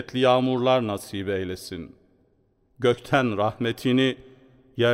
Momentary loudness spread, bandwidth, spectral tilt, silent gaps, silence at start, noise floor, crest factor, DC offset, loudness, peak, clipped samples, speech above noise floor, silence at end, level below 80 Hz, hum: 17 LU; 16 kHz; -6 dB/octave; none; 0 s; -65 dBFS; 18 dB; under 0.1%; -24 LUFS; -6 dBFS; under 0.1%; 42 dB; 0 s; -60 dBFS; none